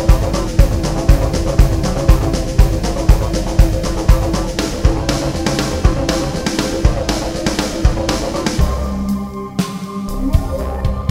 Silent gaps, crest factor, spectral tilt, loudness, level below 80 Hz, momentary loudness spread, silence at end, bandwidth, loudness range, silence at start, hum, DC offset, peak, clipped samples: none; 14 dB; -5.5 dB/octave; -17 LUFS; -16 dBFS; 6 LU; 0 s; 16 kHz; 3 LU; 0 s; none; 0.4%; 0 dBFS; 0.2%